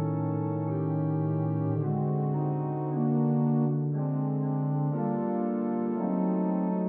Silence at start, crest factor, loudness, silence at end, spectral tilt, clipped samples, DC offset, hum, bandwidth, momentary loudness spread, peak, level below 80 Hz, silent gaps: 0 s; 12 dB; -29 LUFS; 0 s; -12.5 dB/octave; under 0.1%; under 0.1%; none; 2.6 kHz; 4 LU; -16 dBFS; -82 dBFS; none